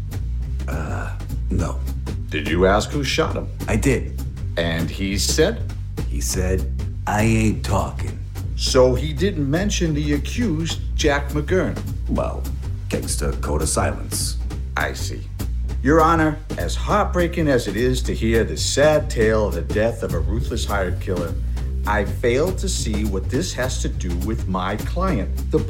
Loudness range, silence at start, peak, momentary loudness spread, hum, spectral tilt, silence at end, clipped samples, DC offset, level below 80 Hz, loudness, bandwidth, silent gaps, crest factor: 4 LU; 0 s; -4 dBFS; 10 LU; none; -5 dB/octave; 0 s; under 0.1%; under 0.1%; -26 dBFS; -22 LUFS; 16.5 kHz; none; 18 dB